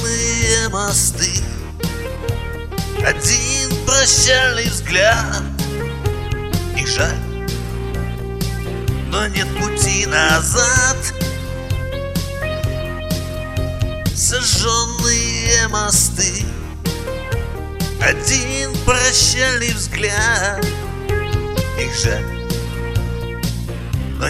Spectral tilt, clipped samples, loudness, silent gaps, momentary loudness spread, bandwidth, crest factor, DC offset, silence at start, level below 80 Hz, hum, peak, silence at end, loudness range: -2.5 dB/octave; under 0.1%; -17 LUFS; none; 11 LU; 16 kHz; 18 dB; under 0.1%; 0 s; -28 dBFS; none; 0 dBFS; 0 s; 7 LU